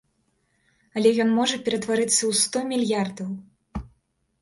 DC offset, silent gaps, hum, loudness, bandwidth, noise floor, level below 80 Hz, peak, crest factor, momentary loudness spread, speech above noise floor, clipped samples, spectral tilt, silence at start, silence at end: under 0.1%; none; none; -23 LUFS; 11.5 kHz; -70 dBFS; -50 dBFS; -6 dBFS; 18 dB; 18 LU; 47 dB; under 0.1%; -3 dB/octave; 0.95 s; 0.55 s